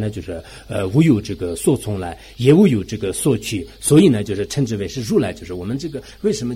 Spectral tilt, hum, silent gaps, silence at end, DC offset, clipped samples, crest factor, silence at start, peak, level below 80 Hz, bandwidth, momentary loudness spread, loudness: -6 dB/octave; none; none; 0 s; under 0.1%; under 0.1%; 16 dB; 0 s; -2 dBFS; -44 dBFS; 16 kHz; 15 LU; -18 LUFS